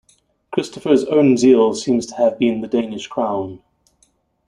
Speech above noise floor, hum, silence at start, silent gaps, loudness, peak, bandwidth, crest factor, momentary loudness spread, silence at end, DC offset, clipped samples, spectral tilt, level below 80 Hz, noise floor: 45 dB; none; 0.5 s; none; -17 LUFS; -2 dBFS; 11 kHz; 16 dB; 12 LU; 0.9 s; under 0.1%; under 0.1%; -5.5 dB/octave; -58 dBFS; -61 dBFS